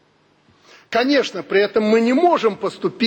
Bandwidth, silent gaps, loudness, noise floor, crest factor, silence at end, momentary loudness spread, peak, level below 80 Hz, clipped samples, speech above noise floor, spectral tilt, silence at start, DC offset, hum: 17 kHz; none; -18 LUFS; -57 dBFS; 14 dB; 0 s; 8 LU; -4 dBFS; -64 dBFS; under 0.1%; 40 dB; -5 dB/octave; 0.9 s; under 0.1%; none